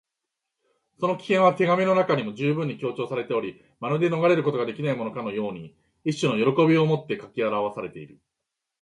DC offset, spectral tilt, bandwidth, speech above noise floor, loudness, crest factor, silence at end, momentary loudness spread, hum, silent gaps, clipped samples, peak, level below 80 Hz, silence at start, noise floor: under 0.1%; -7 dB/octave; 11 kHz; 60 dB; -24 LUFS; 18 dB; 0.75 s; 13 LU; none; none; under 0.1%; -6 dBFS; -68 dBFS; 1 s; -84 dBFS